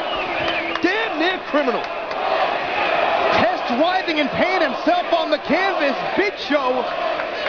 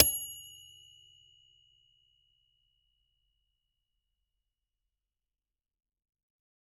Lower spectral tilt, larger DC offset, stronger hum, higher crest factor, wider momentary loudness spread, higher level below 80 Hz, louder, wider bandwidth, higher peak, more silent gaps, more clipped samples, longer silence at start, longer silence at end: first, -4.5 dB/octave vs -1.5 dB/octave; neither; neither; second, 14 dB vs 38 dB; second, 4 LU vs 26 LU; first, -54 dBFS vs -62 dBFS; first, -19 LUFS vs -31 LUFS; second, 5.4 kHz vs 16.5 kHz; second, -6 dBFS vs -2 dBFS; neither; neither; about the same, 0 s vs 0 s; second, 0 s vs 6.2 s